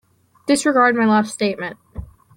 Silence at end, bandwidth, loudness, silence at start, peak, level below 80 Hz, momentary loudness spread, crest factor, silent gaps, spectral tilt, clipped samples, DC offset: 0.35 s; 15 kHz; -17 LUFS; 0.45 s; -4 dBFS; -46 dBFS; 22 LU; 16 dB; none; -4.5 dB/octave; under 0.1%; under 0.1%